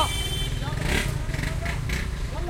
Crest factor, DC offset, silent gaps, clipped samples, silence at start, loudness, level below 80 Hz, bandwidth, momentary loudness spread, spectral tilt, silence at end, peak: 18 dB; under 0.1%; none; under 0.1%; 0 s; -28 LUFS; -30 dBFS; 16.5 kHz; 4 LU; -4 dB/octave; 0 s; -8 dBFS